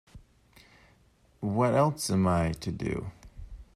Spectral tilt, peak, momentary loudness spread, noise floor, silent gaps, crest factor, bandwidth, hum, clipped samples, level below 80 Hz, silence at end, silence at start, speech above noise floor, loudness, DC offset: -6 dB/octave; -12 dBFS; 23 LU; -63 dBFS; none; 20 dB; 14.5 kHz; none; under 0.1%; -50 dBFS; 0.1 s; 0.15 s; 36 dB; -28 LUFS; under 0.1%